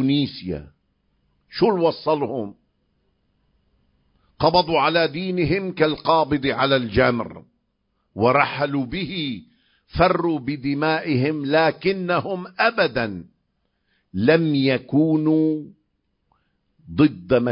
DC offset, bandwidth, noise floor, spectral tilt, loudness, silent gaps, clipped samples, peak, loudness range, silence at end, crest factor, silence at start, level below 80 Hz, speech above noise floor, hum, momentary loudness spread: under 0.1%; 5.4 kHz; -71 dBFS; -10.5 dB/octave; -21 LUFS; none; under 0.1%; -2 dBFS; 4 LU; 0 s; 20 dB; 0 s; -46 dBFS; 51 dB; none; 12 LU